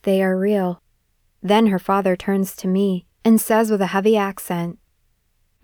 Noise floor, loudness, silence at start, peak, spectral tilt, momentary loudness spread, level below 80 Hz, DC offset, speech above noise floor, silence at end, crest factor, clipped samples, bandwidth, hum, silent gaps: -64 dBFS; -19 LUFS; 0.05 s; -4 dBFS; -6 dB/octave; 9 LU; -58 dBFS; under 0.1%; 46 dB; 0.9 s; 16 dB; under 0.1%; over 20 kHz; none; none